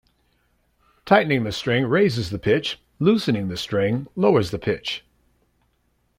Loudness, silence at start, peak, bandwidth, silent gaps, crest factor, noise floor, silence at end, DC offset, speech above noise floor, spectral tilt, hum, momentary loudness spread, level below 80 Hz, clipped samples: -21 LUFS; 1.05 s; -2 dBFS; 15.5 kHz; none; 20 dB; -67 dBFS; 1.2 s; under 0.1%; 46 dB; -6 dB/octave; 60 Hz at -45 dBFS; 7 LU; -54 dBFS; under 0.1%